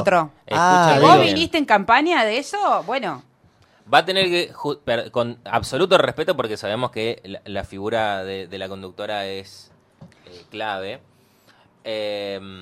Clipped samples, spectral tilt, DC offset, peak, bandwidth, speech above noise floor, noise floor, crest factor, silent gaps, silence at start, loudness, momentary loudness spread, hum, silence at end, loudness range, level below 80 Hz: under 0.1%; -4.5 dB/octave; under 0.1%; 0 dBFS; 15 kHz; 36 dB; -56 dBFS; 20 dB; none; 0 s; -20 LUFS; 17 LU; none; 0 s; 15 LU; -56 dBFS